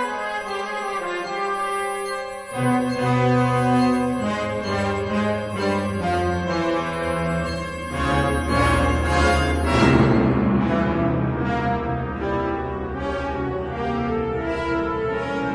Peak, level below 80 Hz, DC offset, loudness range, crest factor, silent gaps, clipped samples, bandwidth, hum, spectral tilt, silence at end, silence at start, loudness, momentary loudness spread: -4 dBFS; -34 dBFS; under 0.1%; 6 LU; 18 dB; none; under 0.1%; 10.5 kHz; none; -6.5 dB/octave; 0 s; 0 s; -22 LUFS; 8 LU